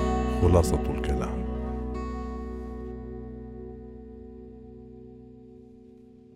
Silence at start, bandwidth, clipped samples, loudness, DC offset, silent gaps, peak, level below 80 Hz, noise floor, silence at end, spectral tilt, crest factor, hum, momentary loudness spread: 0 s; 15 kHz; under 0.1%; -29 LUFS; under 0.1%; none; -8 dBFS; -36 dBFS; -51 dBFS; 0.05 s; -7 dB/octave; 22 dB; none; 26 LU